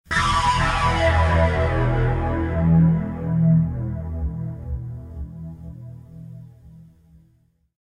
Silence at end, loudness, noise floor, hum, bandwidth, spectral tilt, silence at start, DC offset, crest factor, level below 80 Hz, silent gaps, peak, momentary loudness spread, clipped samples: 1.2 s; -21 LUFS; -61 dBFS; none; 11 kHz; -6.5 dB/octave; 0.1 s; under 0.1%; 16 dB; -30 dBFS; none; -6 dBFS; 21 LU; under 0.1%